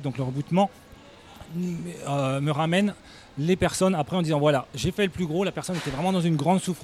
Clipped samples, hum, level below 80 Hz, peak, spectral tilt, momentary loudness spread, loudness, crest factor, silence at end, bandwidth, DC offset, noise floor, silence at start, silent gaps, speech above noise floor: under 0.1%; none; -52 dBFS; -8 dBFS; -6 dB/octave; 9 LU; -25 LUFS; 18 dB; 0 s; 14.5 kHz; under 0.1%; -48 dBFS; 0 s; none; 23 dB